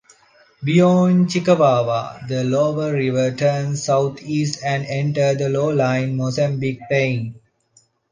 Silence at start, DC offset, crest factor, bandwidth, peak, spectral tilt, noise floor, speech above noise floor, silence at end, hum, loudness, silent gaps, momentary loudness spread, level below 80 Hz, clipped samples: 0.6 s; under 0.1%; 16 dB; 9.8 kHz; -4 dBFS; -6.5 dB/octave; -58 dBFS; 40 dB; 0.75 s; none; -19 LUFS; none; 8 LU; -60 dBFS; under 0.1%